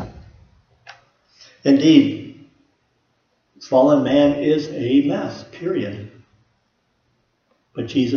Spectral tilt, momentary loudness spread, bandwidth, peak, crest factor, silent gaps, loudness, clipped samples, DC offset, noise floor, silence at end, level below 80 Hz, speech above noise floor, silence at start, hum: -7 dB/octave; 19 LU; 6.8 kHz; 0 dBFS; 20 dB; none; -18 LUFS; under 0.1%; under 0.1%; -67 dBFS; 0 s; -54 dBFS; 50 dB; 0 s; none